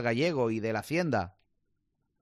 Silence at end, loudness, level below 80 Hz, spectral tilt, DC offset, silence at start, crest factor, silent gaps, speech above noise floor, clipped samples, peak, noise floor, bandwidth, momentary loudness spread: 0.9 s; -30 LUFS; -66 dBFS; -6.5 dB/octave; under 0.1%; 0 s; 16 dB; none; 48 dB; under 0.1%; -16 dBFS; -78 dBFS; 14.5 kHz; 5 LU